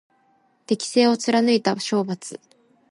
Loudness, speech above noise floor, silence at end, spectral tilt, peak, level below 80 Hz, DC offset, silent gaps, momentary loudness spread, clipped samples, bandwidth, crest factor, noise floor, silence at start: -21 LUFS; 42 dB; 0.55 s; -4.5 dB/octave; -4 dBFS; -72 dBFS; under 0.1%; none; 14 LU; under 0.1%; 11.5 kHz; 18 dB; -63 dBFS; 0.7 s